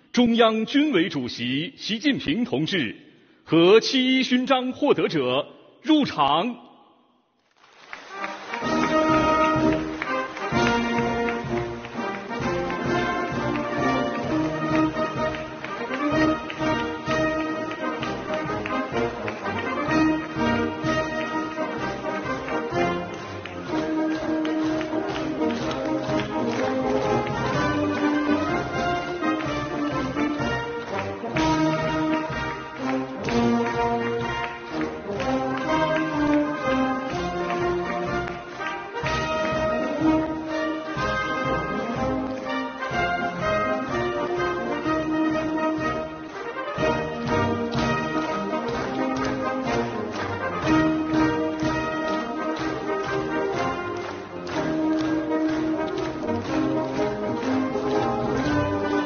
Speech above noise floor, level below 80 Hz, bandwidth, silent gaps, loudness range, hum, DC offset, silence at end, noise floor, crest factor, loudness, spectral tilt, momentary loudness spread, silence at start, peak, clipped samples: 44 dB; -48 dBFS; 6.6 kHz; none; 4 LU; none; under 0.1%; 0 s; -65 dBFS; 20 dB; -25 LUFS; -4 dB/octave; 8 LU; 0.15 s; -4 dBFS; under 0.1%